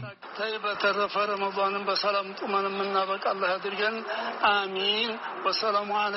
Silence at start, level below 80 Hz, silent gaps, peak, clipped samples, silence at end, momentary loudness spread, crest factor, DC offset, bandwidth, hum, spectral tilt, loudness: 0 s; -72 dBFS; none; -10 dBFS; under 0.1%; 0 s; 5 LU; 18 dB; under 0.1%; 6 kHz; none; 0 dB/octave; -27 LUFS